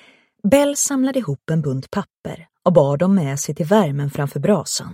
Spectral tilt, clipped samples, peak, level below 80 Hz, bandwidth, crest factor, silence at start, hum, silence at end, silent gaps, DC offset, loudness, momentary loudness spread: -5.5 dB/octave; under 0.1%; 0 dBFS; -54 dBFS; 16.5 kHz; 18 dB; 0.45 s; none; 0 s; 2.10-2.23 s; under 0.1%; -19 LUFS; 11 LU